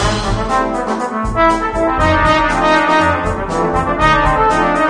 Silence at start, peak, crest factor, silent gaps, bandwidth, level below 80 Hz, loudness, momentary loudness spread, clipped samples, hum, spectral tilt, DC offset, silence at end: 0 s; 0 dBFS; 12 dB; none; 10 kHz; -26 dBFS; -14 LUFS; 7 LU; under 0.1%; none; -5 dB/octave; under 0.1%; 0 s